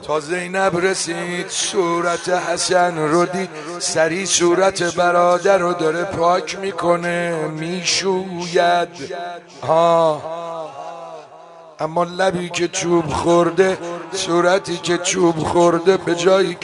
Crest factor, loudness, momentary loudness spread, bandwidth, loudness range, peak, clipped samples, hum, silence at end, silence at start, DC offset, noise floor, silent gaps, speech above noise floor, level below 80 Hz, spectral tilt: 16 dB; -18 LUFS; 13 LU; 11.5 kHz; 4 LU; -2 dBFS; under 0.1%; none; 0 s; 0 s; under 0.1%; -41 dBFS; none; 23 dB; -52 dBFS; -4 dB/octave